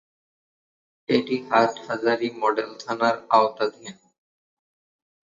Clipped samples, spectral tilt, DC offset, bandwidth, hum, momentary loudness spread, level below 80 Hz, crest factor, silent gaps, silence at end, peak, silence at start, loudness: under 0.1%; -5 dB/octave; under 0.1%; 7.6 kHz; none; 11 LU; -72 dBFS; 22 dB; none; 1.3 s; -4 dBFS; 1.1 s; -23 LUFS